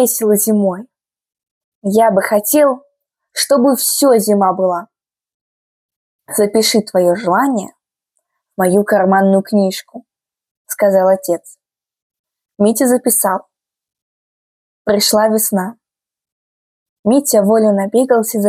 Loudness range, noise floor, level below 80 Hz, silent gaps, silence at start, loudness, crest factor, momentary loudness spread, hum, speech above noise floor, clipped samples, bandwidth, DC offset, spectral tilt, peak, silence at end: 4 LU; -72 dBFS; -64 dBFS; 1.51-1.82 s, 5.34-5.89 s, 5.96-6.19 s, 10.51-10.65 s, 12.02-12.10 s, 12.19-12.24 s, 14.02-14.85 s, 16.32-17.03 s; 0 s; -13 LUFS; 14 dB; 11 LU; none; 59 dB; under 0.1%; 16 kHz; under 0.1%; -4 dB/octave; 0 dBFS; 0 s